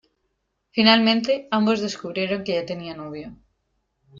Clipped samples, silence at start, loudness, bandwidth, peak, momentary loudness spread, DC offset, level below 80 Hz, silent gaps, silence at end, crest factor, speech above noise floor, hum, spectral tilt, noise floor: under 0.1%; 0.75 s; -21 LUFS; 7.6 kHz; -4 dBFS; 19 LU; under 0.1%; -62 dBFS; none; 0 s; 20 dB; 52 dB; none; -5 dB/octave; -74 dBFS